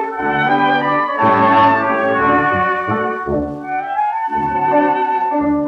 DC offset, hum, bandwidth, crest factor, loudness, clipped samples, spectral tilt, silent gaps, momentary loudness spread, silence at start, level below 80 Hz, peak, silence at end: under 0.1%; none; 6.8 kHz; 12 dB; -15 LUFS; under 0.1%; -7.5 dB/octave; none; 8 LU; 0 s; -46 dBFS; -2 dBFS; 0 s